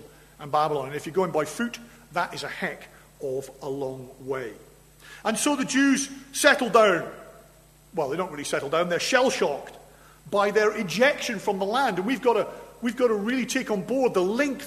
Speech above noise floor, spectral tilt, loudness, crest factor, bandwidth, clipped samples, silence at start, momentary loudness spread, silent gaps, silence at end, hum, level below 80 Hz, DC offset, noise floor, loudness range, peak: 29 dB; -3.5 dB/octave; -25 LUFS; 24 dB; 13.5 kHz; under 0.1%; 0 s; 13 LU; none; 0 s; none; -60 dBFS; under 0.1%; -54 dBFS; 8 LU; -2 dBFS